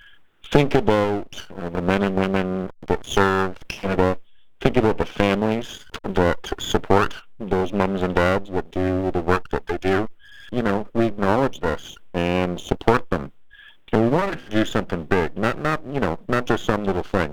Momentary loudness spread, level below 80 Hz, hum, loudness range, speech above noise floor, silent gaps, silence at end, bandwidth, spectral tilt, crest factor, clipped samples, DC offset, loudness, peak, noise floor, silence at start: 9 LU; -40 dBFS; none; 1 LU; 27 dB; none; 0 s; 19.5 kHz; -6.5 dB/octave; 20 dB; under 0.1%; under 0.1%; -22 LUFS; 0 dBFS; -48 dBFS; 0.1 s